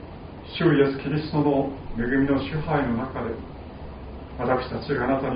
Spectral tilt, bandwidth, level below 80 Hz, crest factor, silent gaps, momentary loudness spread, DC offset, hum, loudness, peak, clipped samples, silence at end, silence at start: -6 dB/octave; 5.2 kHz; -42 dBFS; 18 dB; none; 18 LU; under 0.1%; none; -25 LUFS; -8 dBFS; under 0.1%; 0 s; 0 s